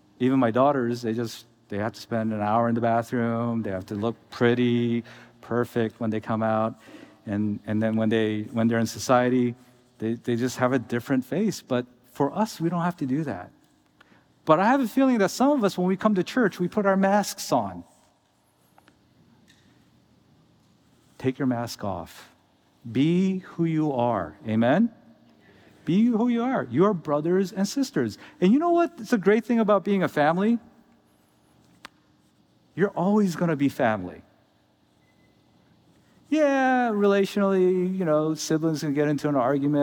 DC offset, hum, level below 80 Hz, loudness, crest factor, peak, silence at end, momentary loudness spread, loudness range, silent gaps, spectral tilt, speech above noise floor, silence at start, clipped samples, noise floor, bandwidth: under 0.1%; none; -70 dBFS; -24 LUFS; 20 dB; -4 dBFS; 0 s; 10 LU; 6 LU; none; -6.5 dB/octave; 41 dB; 0.2 s; under 0.1%; -65 dBFS; 19.5 kHz